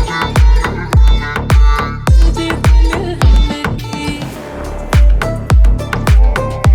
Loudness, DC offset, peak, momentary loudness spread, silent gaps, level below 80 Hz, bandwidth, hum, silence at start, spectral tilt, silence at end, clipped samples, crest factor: -13 LUFS; under 0.1%; 0 dBFS; 9 LU; none; -12 dBFS; 12.5 kHz; none; 0 s; -6 dB/octave; 0 s; under 0.1%; 10 dB